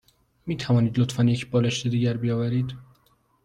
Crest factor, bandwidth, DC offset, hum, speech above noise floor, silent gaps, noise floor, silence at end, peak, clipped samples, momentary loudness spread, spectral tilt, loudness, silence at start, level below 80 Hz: 14 dB; 10.5 kHz; under 0.1%; none; 41 dB; none; -64 dBFS; 0.6 s; -10 dBFS; under 0.1%; 11 LU; -6.5 dB/octave; -24 LUFS; 0.45 s; -56 dBFS